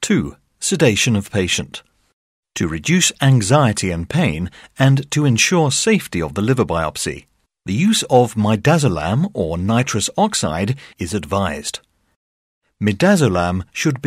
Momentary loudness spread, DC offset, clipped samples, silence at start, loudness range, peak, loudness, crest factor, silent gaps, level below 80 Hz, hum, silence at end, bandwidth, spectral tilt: 11 LU; under 0.1%; under 0.1%; 0 s; 4 LU; 0 dBFS; -17 LUFS; 18 dB; 2.13-2.43 s, 12.16-12.61 s; -42 dBFS; none; 0 s; 15.5 kHz; -4.5 dB/octave